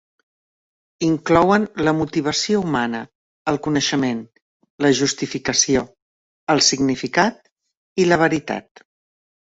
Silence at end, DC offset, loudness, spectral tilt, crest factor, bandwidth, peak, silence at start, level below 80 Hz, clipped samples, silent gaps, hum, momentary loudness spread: 0.95 s; under 0.1%; -19 LUFS; -3.5 dB/octave; 20 dB; 8 kHz; -2 dBFS; 1 s; -52 dBFS; under 0.1%; 3.15-3.45 s, 4.42-4.60 s, 4.70-4.78 s, 6.02-6.47 s, 7.52-7.56 s, 7.77-7.96 s; none; 13 LU